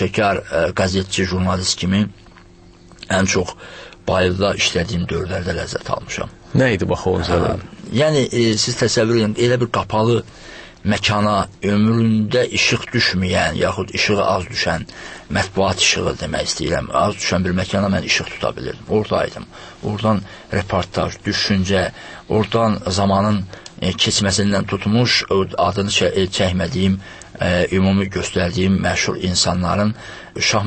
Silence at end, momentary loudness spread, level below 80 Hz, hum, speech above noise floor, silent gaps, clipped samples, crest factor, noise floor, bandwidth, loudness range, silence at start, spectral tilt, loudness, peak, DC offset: 0 s; 9 LU; -40 dBFS; none; 26 dB; none; under 0.1%; 16 dB; -44 dBFS; 8.8 kHz; 3 LU; 0 s; -4.5 dB/octave; -18 LUFS; -2 dBFS; under 0.1%